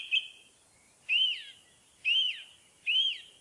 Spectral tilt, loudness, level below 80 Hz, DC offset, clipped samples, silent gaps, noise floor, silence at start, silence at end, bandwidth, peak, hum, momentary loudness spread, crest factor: 3 dB/octave; -28 LUFS; -84 dBFS; under 0.1%; under 0.1%; none; -63 dBFS; 0 s; 0.15 s; 11.5 kHz; -18 dBFS; none; 19 LU; 14 dB